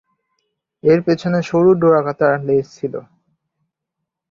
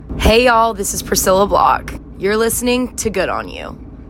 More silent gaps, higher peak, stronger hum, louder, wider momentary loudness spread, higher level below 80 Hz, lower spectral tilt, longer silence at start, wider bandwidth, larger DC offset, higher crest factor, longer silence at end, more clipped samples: neither; about the same, -2 dBFS vs 0 dBFS; neither; about the same, -16 LUFS vs -15 LUFS; about the same, 13 LU vs 14 LU; second, -58 dBFS vs -28 dBFS; first, -8 dB/octave vs -3.5 dB/octave; first, 0.85 s vs 0 s; second, 7.4 kHz vs 16.5 kHz; neither; about the same, 16 dB vs 14 dB; first, 1.3 s vs 0 s; neither